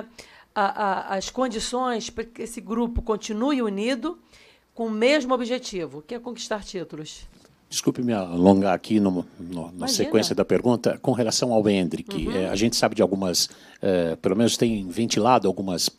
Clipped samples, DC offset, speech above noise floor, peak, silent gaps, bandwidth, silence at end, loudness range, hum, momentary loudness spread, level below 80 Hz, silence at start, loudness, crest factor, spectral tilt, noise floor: under 0.1%; under 0.1%; 25 dB; 0 dBFS; none; 15.5 kHz; 0.1 s; 5 LU; none; 14 LU; -46 dBFS; 0 s; -24 LUFS; 24 dB; -4.5 dB/octave; -48 dBFS